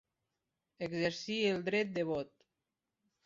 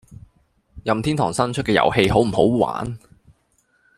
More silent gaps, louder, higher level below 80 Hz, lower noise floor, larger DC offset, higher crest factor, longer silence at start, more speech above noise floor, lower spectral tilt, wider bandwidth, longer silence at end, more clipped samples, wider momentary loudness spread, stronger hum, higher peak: neither; second, -35 LUFS vs -19 LUFS; second, -74 dBFS vs -44 dBFS; first, -89 dBFS vs -64 dBFS; neither; about the same, 20 dB vs 20 dB; first, 0.8 s vs 0.1 s; first, 54 dB vs 45 dB; second, -3.5 dB/octave vs -6 dB/octave; second, 7.6 kHz vs 14.5 kHz; about the same, 1 s vs 1 s; neither; second, 9 LU vs 13 LU; neither; second, -18 dBFS vs -2 dBFS